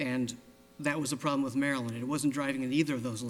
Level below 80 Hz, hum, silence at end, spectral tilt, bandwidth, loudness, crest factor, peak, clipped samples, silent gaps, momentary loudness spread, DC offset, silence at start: -70 dBFS; none; 0 s; -5 dB/octave; 16.5 kHz; -32 LUFS; 16 dB; -16 dBFS; under 0.1%; none; 5 LU; under 0.1%; 0 s